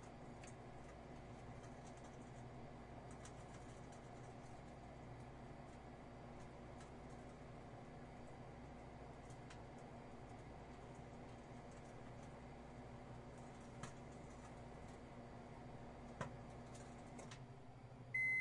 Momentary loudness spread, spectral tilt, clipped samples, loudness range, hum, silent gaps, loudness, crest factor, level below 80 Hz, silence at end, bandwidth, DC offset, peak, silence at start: 2 LU; -5.5 dB/octave; under 0.1%; 2 LU; none; none; -55 LUFS; 22 dB; -66 dBFS; 0 s; 11 kHz; under 0.1%; -32 dBFS; 0 s